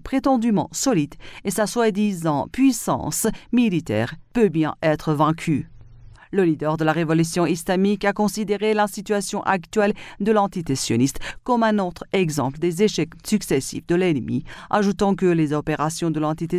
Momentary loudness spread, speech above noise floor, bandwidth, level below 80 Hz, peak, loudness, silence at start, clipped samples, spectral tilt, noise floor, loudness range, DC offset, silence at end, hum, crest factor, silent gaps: 5 LU; 23 dB; 16 kHz; -48 dBFS; -6 dBFS; -22 LUFS; 0.05 s; under 0.1%; -5.5 dB/octave; -44 dBFS; 1 LU; under 0.1%; 0 s; none; 16 dB; none